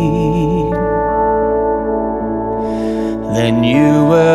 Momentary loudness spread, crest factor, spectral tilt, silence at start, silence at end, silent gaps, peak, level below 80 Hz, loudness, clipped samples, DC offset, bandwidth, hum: 8 LU; 14 dB; -7.5 dB/octave; 0 s; 0 s; none; 0 dBFS; -32 dBFS; -15 LUFS; under 0.1%; under 0.1%; 13 kHz; none